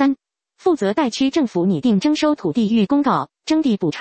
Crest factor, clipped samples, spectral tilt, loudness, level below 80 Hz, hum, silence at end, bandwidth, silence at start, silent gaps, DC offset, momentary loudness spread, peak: 14 dB; under 0.1%; -6 dB/octave; -18 LUFS; -56 dBFS; none; 0 s; 8.6 kHz; 0 s; none; under 0.1%; 4 LU; -4 dBFS